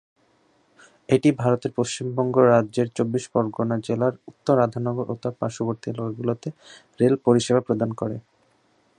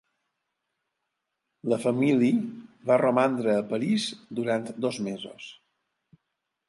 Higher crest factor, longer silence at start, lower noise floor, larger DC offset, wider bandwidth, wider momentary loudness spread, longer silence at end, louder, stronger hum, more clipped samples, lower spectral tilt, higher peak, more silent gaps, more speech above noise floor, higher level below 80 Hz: about the same, 20 dB vs 18 dB; second, 1.1 s vs 1.65 s; second, -63 dBFS vs -82 dBFS; neither; about the same, 10.5 kHz vs 11.5 kHz; second, 11 LU vs 15 LU; second, 0.8 s vs 1.15 s; first, -23 LUFS vs -26 LUFS; neither; neither; about the same, -6.5 dB/octave vs -6 dB/octave; first, -4 dBFS vs -10 dBFS; neither; second, 41 dB vs 57 dB; first, -62 dBFS vs -76 dBFS